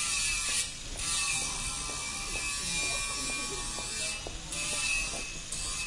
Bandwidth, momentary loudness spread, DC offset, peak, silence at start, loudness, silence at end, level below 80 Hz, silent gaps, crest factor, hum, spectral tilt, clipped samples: 11.5 kHz; 7 LU; under 0.1%; -16 dBFS; 0 s; -31 LUFS; 0 s; -46 dBFS; none; 16 dB; none; 0 dB/octave; under 0.1%